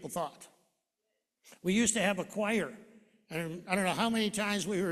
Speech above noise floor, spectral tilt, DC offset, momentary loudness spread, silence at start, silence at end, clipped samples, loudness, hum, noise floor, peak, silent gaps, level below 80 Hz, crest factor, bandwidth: 52 dB; -3.5 dB/octave; under 0.1%; 11 LU; 0 s; 0 s; under 0.1%; -32 LUFS; none; -84 dBFS; -12 dBFS; none; -68 dBFS; 22 dB; 14 kHz